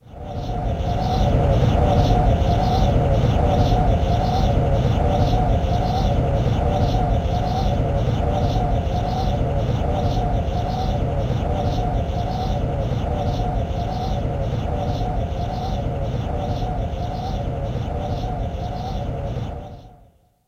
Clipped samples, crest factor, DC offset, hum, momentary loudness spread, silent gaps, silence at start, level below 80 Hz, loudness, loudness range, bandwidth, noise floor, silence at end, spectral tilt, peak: under 0.1%; 16 dB; under 0.1%; none; 8 LU; none; 0.1 s; -24 dBFS; -22 LUFS; 7 LU; 7.4 kHz; -53 dBFS; 0.55 s; -8 dB/octave; -4 dBFS